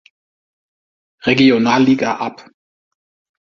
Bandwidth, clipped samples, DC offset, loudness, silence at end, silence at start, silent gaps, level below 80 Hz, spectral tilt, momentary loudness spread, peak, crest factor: 7.2 kHz; under 0.1%; under 0.1%; -14 LUFS; 1 s; 1.25 s; none; -58 dBFS; -5.5 dB/octave; 12 LU; 0 dBFS; 18 dB